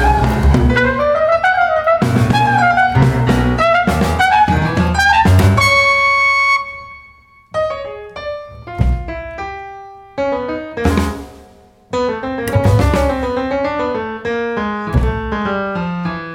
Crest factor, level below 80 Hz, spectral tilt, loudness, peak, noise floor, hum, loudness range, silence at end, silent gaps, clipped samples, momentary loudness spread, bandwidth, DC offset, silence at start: 12 dB; -24 dBFS; -6 dB/octave; -14 LUFS; -2 dBFS; -45 dBFS; none; 10 LU; 0 s; none; under 0.1%; 16 LU; 17.5 kHz; under 0.1%; 0 s